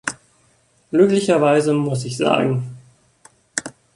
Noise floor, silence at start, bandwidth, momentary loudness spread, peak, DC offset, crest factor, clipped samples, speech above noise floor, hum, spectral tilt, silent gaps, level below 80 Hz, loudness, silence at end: -59 dBFS; 0.05 s; 11.5 kHz; 13 LU; 0 dBFS; under 0.1%; 20 dB; under 0.1%; 42 dB; none; -5.5 dB/octave; none; -60 dBFS; -18 LUFS; 0.25 s